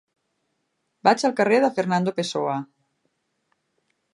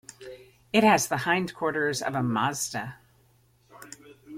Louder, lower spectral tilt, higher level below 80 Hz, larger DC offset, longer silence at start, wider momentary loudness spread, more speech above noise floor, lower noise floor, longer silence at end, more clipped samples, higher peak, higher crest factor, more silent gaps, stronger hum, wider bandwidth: first, -22 LUFS vs -25 LUFS; about the same, -5 dB/octave vs -4 dB/octave; second, -76 dBFS vs -64 dBFS; neither; first, 1.05 s vs 0.2 s; second, 7 LU vs 24 LU; first, 54 dB vs 37 dB; first, -75 dBFS vs -63 dBFS; first, 1.5 s vs 0 s; neither; first, -2 dBFS vs -6 dBFS; about the same, 24 dB vs 22 dB; neither; neither; second, 11.5 kHz vs 16.5 kHz